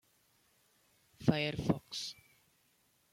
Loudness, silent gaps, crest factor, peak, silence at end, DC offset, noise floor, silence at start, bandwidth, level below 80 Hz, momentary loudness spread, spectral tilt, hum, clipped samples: -36 LUFS; none; 26 dB; -14 dBFS; 1 s; under 0.1%; -73 dBFS; 1.2 s; 16 kHz; -64 dBFS; 11 LU; -5.5 dB/octave; none; under 0.1%